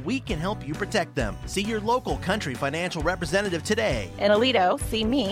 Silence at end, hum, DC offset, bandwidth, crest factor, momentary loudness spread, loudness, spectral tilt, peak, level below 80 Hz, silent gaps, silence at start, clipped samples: 0 s; none; under 0.1%; 16 kHz; 16 dB; 8 LU; -25 LUFS; -4.5 dB/octave; -10 dBFS; -40 dBFS; none; 0 s; under 0.1%